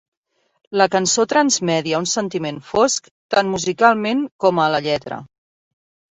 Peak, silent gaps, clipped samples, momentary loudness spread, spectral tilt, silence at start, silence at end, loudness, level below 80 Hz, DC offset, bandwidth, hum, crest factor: -2 dBFS; 3.11-3.29 s, 4.32-4.39 s; under 0.1%; 9 LU; -3.5 dB/octave; 0.7 s; 0.85 s; -18 LUFS; -58 dBFS; under 0.1%; 8.4 kHz; none; 18 dB